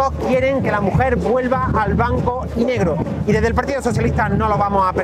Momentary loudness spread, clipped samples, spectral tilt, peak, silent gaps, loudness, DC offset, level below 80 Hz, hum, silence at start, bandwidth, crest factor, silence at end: 3 LU; under 0.1%; -7.5 dB/octave; -2 dBFS; none; -18 LUFS; under 0.1%; -30 dBFS; none; 0 s; 13.5 kHz; 14 dB; 0 s